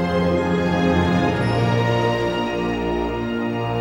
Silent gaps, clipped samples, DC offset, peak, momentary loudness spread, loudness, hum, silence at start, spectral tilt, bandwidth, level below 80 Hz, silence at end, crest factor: none; under 0.1%; under 0.1%; -6 dBFS; 5 LU; -20 LUFS; none; 0 s; -7 dB/octave; 16 kHz; -38 dBFS; 0 s; 14 dB